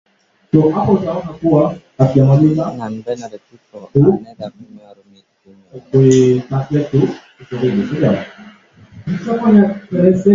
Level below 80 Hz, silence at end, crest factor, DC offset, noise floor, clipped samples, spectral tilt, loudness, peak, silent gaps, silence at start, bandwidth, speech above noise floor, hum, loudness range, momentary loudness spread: -48 dBFS; 0 s; 14 dB; under 0.1%; -42 dBFS; under 0.1%; -8.5 dB/octave; -15 LUFS; 0 dBFS; none; 0.55 s; 7.6 kHz; 28 dB; none; 4 LU; 15 LU